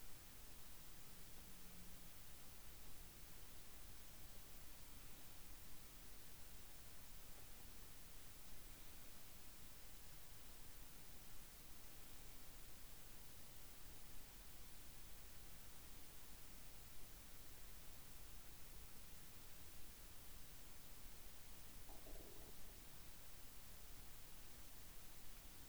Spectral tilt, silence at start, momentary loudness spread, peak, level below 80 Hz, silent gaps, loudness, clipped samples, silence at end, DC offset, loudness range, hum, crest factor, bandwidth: -2.5 dB/octave; 0 s; 0 LU; -42 dBFS; -64 dBFS; none; -58 LUFS; under 0.1%; 0 s; 0.1%; 0 LU; none; 14 dB; over 20 kHz